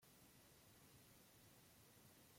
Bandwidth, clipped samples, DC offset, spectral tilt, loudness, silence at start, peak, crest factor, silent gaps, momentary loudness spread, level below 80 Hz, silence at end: 16.5 kHz; under 0.1%; under 0.1%; -3 dB/octave; -68 LUFS; 0 s; -56 dBFS; 14 dB; none; 1 LU; -84 dBFS; 0 s